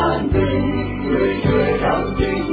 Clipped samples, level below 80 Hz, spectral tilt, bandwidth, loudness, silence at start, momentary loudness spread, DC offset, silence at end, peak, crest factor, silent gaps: under 0.1%; -30 dBFS; -10 dB/octave; 4.9 kHz; -19 LUFS; 0 s; 4 LU; under 0.1%; 0 s; -4 dBFS; 14 dB; none